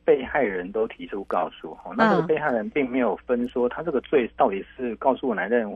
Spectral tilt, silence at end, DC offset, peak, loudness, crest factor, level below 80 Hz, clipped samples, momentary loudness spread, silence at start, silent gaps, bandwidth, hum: -8 dB/octave; 0 s; under 0.1%; -6 dBFS; -24 LUFS; 18 dB; -54 dBFS; under 0.1%; 9 LU; 0.05 s; none; 7 kHz; none